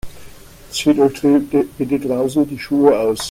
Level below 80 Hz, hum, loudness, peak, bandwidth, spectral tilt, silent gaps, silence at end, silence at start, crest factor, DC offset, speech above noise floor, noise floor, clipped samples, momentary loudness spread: -44 dBFS; none; -16 LUFS; 0 dBFS; 16 kHz; -5.5 dB/octave; none; 0 s; 0.05 s; 16 dB; under 0.1%; 23 dB; -39 dBFS; under 0.1%; 6 LU